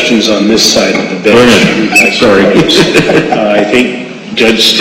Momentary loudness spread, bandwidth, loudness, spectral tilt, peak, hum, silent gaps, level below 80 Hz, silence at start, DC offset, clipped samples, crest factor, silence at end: 5 LU; 17 kHz; -6 LUFS; -3.5 dB/octave; 0 dBFS; none; none; -38 dBFS; 0 s; under 0.1%; 1%; 6 dB; 0 s